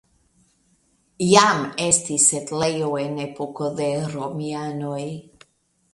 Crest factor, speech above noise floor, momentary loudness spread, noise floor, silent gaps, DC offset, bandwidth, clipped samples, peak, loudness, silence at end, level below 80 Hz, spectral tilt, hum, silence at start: 24 dB; 43 dB; 14 LU; -65 dBFS; none; under 0.1%; 11.5 kHz; under 0.1%; 0 dBFS; -21 LUFS; 0.75 s; -60 dBFS; -3 dB/octave; none; 1.2 s